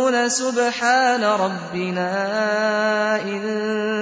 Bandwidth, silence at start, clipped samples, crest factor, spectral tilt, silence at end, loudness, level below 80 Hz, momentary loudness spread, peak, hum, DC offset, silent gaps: 8 kHz; 0 s; under 0.1%; 14 dB; -3.5 dB/octave; 0 s; -20 LUFS; -68 dBFS; 7 LU; -6 dBFS; none; under 0.1%; none